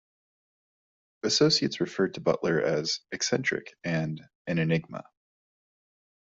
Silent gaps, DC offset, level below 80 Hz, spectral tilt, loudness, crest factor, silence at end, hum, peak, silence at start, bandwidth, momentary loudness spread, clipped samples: 4.35-4.45 s; under 0.1%; -66 dBFS; -4 dB/octave; -27 LUFS; 20 dB; 1.25 s; none; -10 dBFS; 1.25 s; 7.8 kHz; 11 LU; under 0.1%